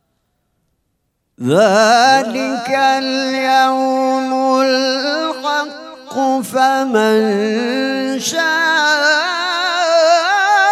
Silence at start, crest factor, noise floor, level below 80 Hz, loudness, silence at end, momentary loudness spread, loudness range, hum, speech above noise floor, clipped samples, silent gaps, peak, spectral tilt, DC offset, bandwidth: 1.4 s; 14 dB; -68 dBFS; -70 dBFS; -14 LUFS; 0 s; 7 LU; 3 LU; none; 54 dB; under 0.1%; none; 0 dBFS; -3 dB/octave; under 0.1%; 15 kHz